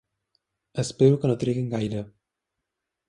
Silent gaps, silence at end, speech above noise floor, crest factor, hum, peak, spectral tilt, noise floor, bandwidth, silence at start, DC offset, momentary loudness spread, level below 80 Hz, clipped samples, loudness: none; 1 s; 61 dB; 20 dB; none; -6 dBFS; -7 dB/octave; -84 dBFS; 11 kHz; 0.75 s; under 0.1%; 15 LU; -58 dBFS; under 0.1%; -24 LUFS